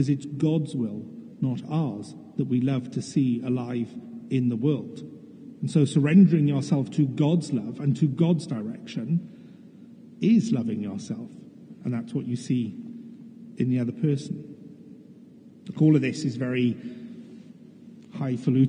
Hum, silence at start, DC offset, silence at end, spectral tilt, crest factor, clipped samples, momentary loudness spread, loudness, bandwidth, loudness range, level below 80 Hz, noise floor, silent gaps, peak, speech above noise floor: none; 0 s; under 0.1%; 0 s; -8 dB/octave; 18 dB; under 0.1%; 21 LU; -26 LUFS; 10 kHz; 7 LU; -76 dBFS; -49 dBFS; none; -8 dBFS; 25 dB